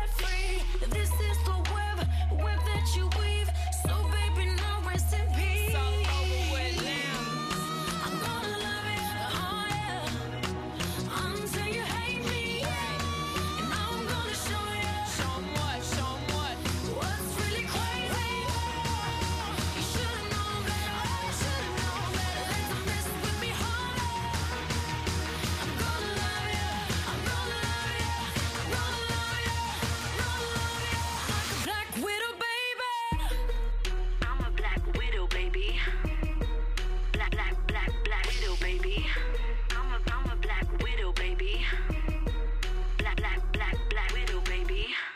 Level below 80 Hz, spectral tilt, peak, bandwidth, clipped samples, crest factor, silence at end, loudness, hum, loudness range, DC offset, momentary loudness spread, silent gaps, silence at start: -32 dBFS; -4 dB/octave; -14 dBFS; 15.5 kHz; under 0.1%; 14 dB; 0 s; -31 LUFS; none; 3 LU; under 0.1%; 4 LU; none; 0 s